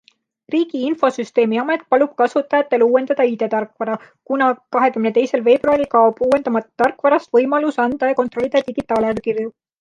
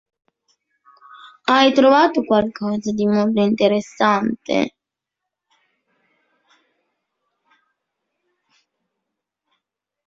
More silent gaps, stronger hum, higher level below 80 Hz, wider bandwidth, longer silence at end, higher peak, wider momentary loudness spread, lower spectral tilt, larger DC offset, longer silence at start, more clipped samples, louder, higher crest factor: neither; neither; about the same, -58 dBFS vs -62 dBFS; first, 10 kHz vs 7.6 kHz; second, 0.3 s vs 5.35 s; about the same, -2 dBFS vs -2 dBFS; second, 7 LU vs 10 LU; about the same, -6 dB/octave vs -5.5 dB/octave; neither; second, 0.5 s vs 1.25 s; neither; about the same, -17 LUFS vs -17 LUFS; about the same, 16 dB vs 20 dB